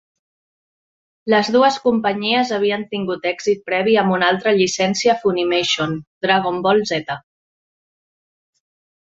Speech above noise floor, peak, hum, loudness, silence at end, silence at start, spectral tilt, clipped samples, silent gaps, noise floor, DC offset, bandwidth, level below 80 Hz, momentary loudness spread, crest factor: over 73 dB; -2 dBFS; none; -18 LUFS; 2 s; 1.25 s; -4 dB/octave; under 0.1%; 6.07-6.21 s; under -90 dBFS; under 0.1%; 8 kHz; -60 dBFS; 8 LU; 18 dB